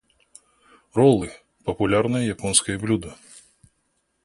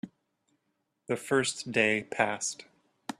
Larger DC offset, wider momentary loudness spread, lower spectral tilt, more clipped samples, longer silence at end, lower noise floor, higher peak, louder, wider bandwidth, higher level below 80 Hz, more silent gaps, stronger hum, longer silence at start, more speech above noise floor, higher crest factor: neither; second, 14 LU vs 19 LU; first, -4.5 dB/octave vs -3 dB/octave; neither; first, 1.1 s vs 0.1 s; second, -71 dBFS vs -79 dBFS; first, -2 dBFS vs -10 dBFS; first, -22 LUFS vs -29 LUFS; second, 11.5 kHz vs 13.5 kHz; first, -50 dBFS vs -74 dBFS; neither; neither; first, 0.95 s vs 0.05 s; about the same, 50 dB vs 50 dB; about the same, 22 dB vs 24 dB